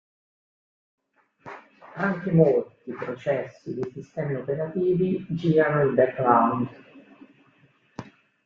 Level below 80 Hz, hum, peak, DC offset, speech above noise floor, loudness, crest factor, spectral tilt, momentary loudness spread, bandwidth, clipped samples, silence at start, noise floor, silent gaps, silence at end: -64 dBFS; none; -4 dBFS; under 0.1%; 38 dB; -24 LUFS; 22 dB; -9.5 dB/octave; 23 LU; 6.8 kHz; under 0.1%; 1.45 s; -61 dBFS; none; 0.4 s